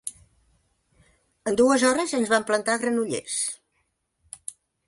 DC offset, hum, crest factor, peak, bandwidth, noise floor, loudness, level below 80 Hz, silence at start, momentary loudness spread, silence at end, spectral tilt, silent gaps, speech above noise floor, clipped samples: under 0.1%; none; 18 dB; -8 dBFS; 11.5 kHz; -73 dBFS; -23 LUFS; -64 dBFS; 0.05 s; 19 LU; 0.35 s; -2.5 dB/octave; none; 51 dB; under 0.1%